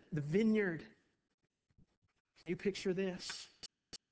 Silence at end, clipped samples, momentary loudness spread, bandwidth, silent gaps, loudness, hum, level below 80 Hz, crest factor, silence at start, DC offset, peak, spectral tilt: 0.15 s; under 0.1%; 20 LU; 8 kHz; 1.34-1.38 s, 1.97-2.02 s, 2.20-2.25 s; -38 LUFS; none; -72 dBFS; 18 dB; 0.1 s; under 0.1%; -22 dBFS; -6 dB/octave